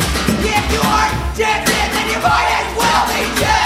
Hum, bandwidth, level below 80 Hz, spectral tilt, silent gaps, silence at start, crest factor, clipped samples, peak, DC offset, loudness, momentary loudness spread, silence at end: none; 16.5 kHz; -26 dBFS; -3.5 dB/octave; none; 0 s; 16 dB; under 0.1%; 0 dBFS; under 0.1%; -15 LUFS; 3 LU; 0 s